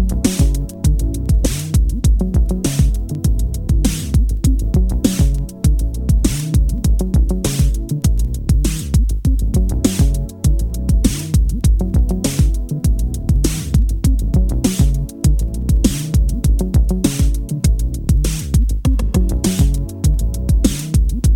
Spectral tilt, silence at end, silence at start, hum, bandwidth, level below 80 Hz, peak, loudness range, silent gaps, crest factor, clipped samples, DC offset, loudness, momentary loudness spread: -6 dB/octave; 0 s; 0 s; none; 16.5 kHz; -16 dBFS; 0 dBFS; 1 LU; none; 14 dB; under 0.1%; under 0.1%; -17 LUFS; 3 LU